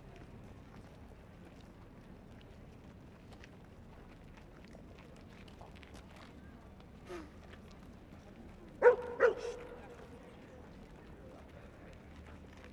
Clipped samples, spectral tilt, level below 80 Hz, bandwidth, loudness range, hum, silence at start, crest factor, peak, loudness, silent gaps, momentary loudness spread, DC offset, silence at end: under 0.1%; -6 dB/octave; -60 dBFS; 10.5 kHz; 20 LU; none; 0 s; 30 dB; -12 dBFS; -33 LUFS; none; 24 LU; under 0.1%; 0 s